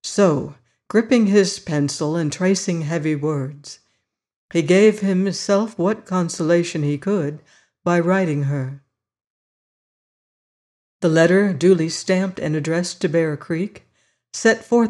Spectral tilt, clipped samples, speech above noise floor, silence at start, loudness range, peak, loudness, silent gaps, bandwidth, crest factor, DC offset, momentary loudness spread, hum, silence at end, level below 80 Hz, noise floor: -5.5 dB/octave; under 0.1%; 53 dB; 0.05 s; 5 LU; -4 dBFS; -19 LUFS; 4.36-4.49 s, 9.30-11.00 s; 11.5 kHz; 16 dB; under 0.1%; 11 LU; none; 0 s; -64 dBFS; -71 dBFS